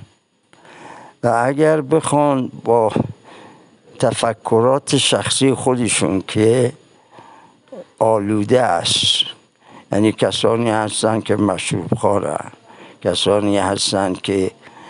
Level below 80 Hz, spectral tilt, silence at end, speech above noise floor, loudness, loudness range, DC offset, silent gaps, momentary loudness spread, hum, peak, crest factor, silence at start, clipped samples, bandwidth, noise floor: -56 dBFS; -4.5 dB/octave; 0 s; 39 dB; -17 LUFS; 2 LU; under 0.1%; none; 6 LU; none; -2 dBFS; 16 dB; 0.75 s; under 0.1%; 11.5 kHz; -55 dBFS